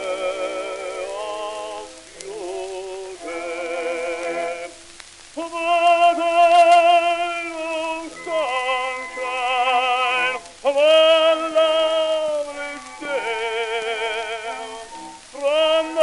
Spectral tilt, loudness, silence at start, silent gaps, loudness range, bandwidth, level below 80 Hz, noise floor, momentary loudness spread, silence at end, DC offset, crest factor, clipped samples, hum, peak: -1 dB/octave; -20 LUFS; 0 s; none; 11 LU; 11.5 kHz; -58 dBFS; -43 dBFS; 18 LU; 0 s; under 0.1%; 16 dB; under 0.1%; none; -4 dBFS